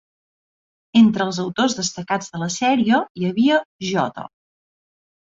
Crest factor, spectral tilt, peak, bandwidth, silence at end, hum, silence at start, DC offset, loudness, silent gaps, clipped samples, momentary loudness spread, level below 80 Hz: 16 dB; -4.5 dB/octave; -4 dBFS; 7.8 kHz; 1.05 s; none; 0.95 s; under 0.1%; -19 LUFS; 3.10-3.15 s, 3.65-3.79 s; under 0.1%; 10 LU; -60 dBFS